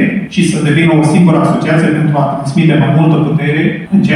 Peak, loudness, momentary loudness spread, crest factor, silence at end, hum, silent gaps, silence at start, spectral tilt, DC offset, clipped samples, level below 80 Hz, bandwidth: 0 dBFS; -10 LUFS; 5 LU; 10 dB; 0 s; none; none; 0 s; -7 dB/octave; under 0.1%; under 0.1%; -46 dBFS; 11 kHz